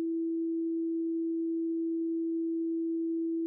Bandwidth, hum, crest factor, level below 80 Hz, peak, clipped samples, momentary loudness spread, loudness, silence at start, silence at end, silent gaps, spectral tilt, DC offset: 0.5 kHz; none; 4 dB; under -90 dBFS; -28 dBFS; under 0.1%; 0 LU; -32 LUFS; 0 s; 0 s; none; -8.5 dB/octave; under 0.1%